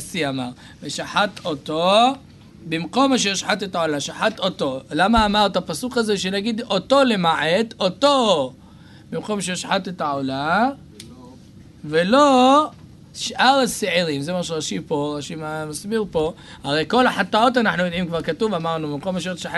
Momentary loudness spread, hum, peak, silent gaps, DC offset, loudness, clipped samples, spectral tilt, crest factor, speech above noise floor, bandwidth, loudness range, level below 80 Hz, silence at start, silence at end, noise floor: 13 LU; none; -2 dBFS; none; under 0.1%; -20 LUFS; under 0.1%; -4 dB/octave; 18 dB; 24 dB; 12 kHz; 4 LU; -48 dBFS; 0 s; 0 s; -44 dBFS